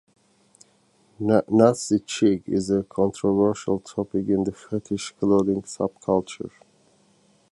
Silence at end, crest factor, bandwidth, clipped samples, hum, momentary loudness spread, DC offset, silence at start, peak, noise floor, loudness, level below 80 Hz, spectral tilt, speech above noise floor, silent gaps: 1.05 s; 22 dB; 11.5 kHz; under 0.1%; none; 11 LU; under 0.1%; 1.2 s; -2 dBFS; -61 dBFS; -23 LUFS; -56 dBFS; -6.5 dB/octave; 39 dB; none